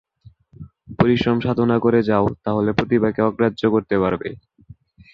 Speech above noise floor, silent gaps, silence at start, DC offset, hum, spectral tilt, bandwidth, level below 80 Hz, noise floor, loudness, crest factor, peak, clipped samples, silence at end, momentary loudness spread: 32 dB; none; 0.6 s; under 0.1%; none; -8.5 dB/octave; 6.6 kHz; -46 dBFS; -50 dBFS; -19 LUFS; 18 dB; -2 dBFS; under 0.1%; 0.8 s; 5 LU